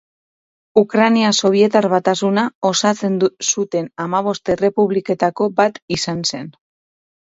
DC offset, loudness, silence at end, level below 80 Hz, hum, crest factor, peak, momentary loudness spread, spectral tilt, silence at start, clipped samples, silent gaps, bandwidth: under 0.1%; -17 LUFS; 0.8 s; -56 dBFS; none; 18 dB; 0 dBFS; 8 LU; -4 dB/octave; 0.75 s; under 0.1%; 2.55-2.61 s, 5.82-5.88 s; 8 kHz